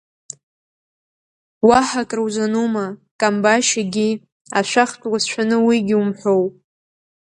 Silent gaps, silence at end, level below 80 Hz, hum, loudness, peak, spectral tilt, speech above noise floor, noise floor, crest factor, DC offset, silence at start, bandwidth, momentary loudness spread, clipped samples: 3.11-3.19 s, 4.32-4.45 s; 0.85 s; -58 dBFS; none; -18 LUFS; 0 dBFS; -4 dB/octave; over 73 dB; under -90 dBFS; 20 dB; under 0.1%; 1.65 s; 11 kHz; 12 LU; under 0.1%